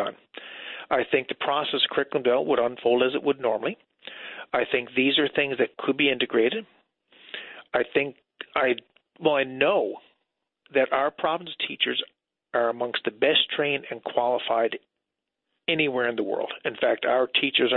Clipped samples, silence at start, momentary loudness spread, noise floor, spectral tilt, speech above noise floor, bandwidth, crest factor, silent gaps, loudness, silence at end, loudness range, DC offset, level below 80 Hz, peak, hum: under 0.1%; 0 s; 15 LU; -84 dBFS; -8.5 dB/octave; 60 dB; 4.4 kHz; 18 dB; none; -25 LUFS; 0 s; 2 LU; under 0.1%; -70 dBFS; -8 dBFS; none